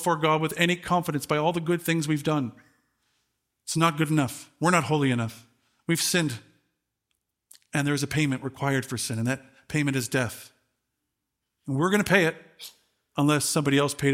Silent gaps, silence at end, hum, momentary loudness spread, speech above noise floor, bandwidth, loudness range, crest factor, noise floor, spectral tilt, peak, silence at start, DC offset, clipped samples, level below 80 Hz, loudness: none; 0 s; none; 13 LU; 57 dB; 16.5 kHz; 4 LU; 22 dB; -82 dBFS; -4.5 dB/octave; -6 dBFS; 0 s; under 0.1%; under 0.1%; -62 dBFS; -25 LUFS